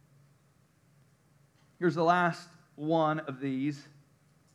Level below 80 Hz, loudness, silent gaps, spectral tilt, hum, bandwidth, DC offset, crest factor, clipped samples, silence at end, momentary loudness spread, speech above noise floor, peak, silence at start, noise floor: -84 dBFS; -30 LUFS; none; -7 dB/octave; none; 11.5 kHz; under 0.1%; 22 dB; under 0.1%; 0.75 s; 17 LU; 37 dB; -12 dBFS; 1.8 s; -66 dBFS